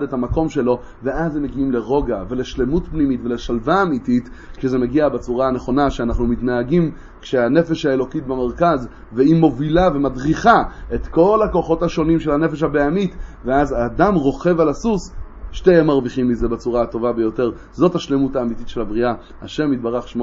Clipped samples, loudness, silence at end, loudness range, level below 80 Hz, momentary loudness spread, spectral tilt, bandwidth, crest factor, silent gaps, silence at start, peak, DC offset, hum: under 0.1%; -18 LUFS; 0 s; 4 LU; -32 dBFS; 9 LU; -7.5 dB/octave; 7.6 kHz; 18 dB; none; 0 s; 0 dBFS; under 0.1%; none